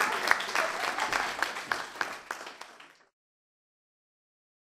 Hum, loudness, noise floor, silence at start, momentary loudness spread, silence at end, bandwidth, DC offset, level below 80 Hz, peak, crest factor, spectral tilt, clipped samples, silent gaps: none; -30 LUFS; -54 dBFS; 0 s; 15 LU; 1.75 s; 15.5 kHz; under 0.1%; -68 dBFS; -4 dBFS; 30 dB; -0.5 dB/octave; under 0.1%; none